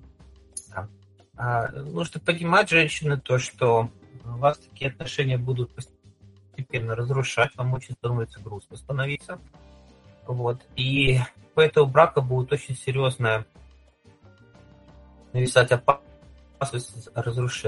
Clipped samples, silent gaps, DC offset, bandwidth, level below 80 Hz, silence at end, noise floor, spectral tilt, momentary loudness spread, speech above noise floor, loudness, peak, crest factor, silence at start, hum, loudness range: under 0.1%; none; under 0.1%; 11.5 kHz; -52 dBFS; 0 s; -56 dBFS; -5.5 dB/octave; 20 LU; 32 dB; -24 LUFS; -2 dBFS; 24 dB; 0.55 s; none; 6 LU